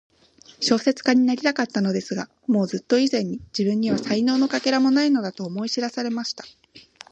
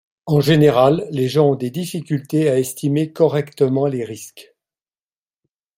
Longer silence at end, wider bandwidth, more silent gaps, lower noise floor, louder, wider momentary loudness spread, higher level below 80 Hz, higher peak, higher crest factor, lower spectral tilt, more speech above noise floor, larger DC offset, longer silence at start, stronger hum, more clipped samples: second, 0.3 s vs 1.35 s; second, 8.4 kHz vs 16 kHz; neither; second, -52 dBFS vs under -90 dBFS; second, -22 LUFS vs -17 LUFS; about the same, 10 LU vs 12 LU; second, -64 dBFS vs -56 dBFS; about the same, -4 dBFS vs -2 dBFS; about the same, 18 dB vs 16 dB; second, -5 dB/octave vs -6.5 dB/octave; second, 31 dB vs over 73 dB; neither; first, 0.6 s vs 0.25 s; neither; neither